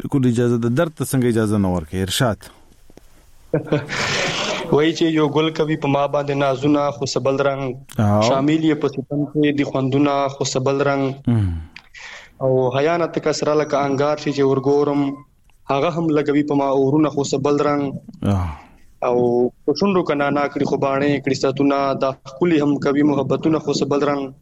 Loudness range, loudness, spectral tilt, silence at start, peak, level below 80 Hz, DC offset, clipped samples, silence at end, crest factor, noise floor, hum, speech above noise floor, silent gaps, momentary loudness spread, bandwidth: 2 LU; -19 LUFS; -6 dB/octave; 0 s; -2 dBFS; -46 dBFS; under 0.1%; under 0.1%; 0.1 s; 16 dB; -46 dBFS; none; 28 dB; none; 6 LU; 15 kHz